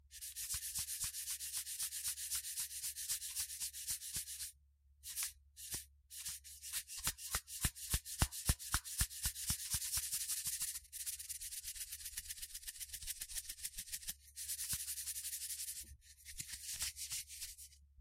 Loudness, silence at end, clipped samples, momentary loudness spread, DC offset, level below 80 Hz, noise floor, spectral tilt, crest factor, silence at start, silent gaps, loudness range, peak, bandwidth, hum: -42 LUFS; 0 s; under 0.1%; 9 LU; under 0.1%; -54 dBFS; -70 dBFS; -0.5 dB/octave; 28 dB; 0.05 s; none; 6 LU; -16 dBFS; 16 kHz; none